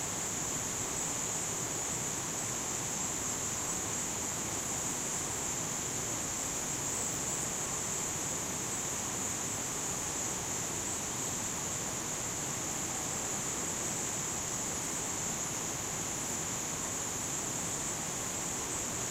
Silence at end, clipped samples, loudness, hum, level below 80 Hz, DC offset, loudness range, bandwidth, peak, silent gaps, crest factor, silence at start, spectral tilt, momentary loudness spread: 0 s; under 0.1%; -33 LUFS; none; -58 dBFS; under 0.1%; 1 LU; 16 kHz; -22 dBFS; none; 14 dB; 0 s; -2 dB/octave; 1 LU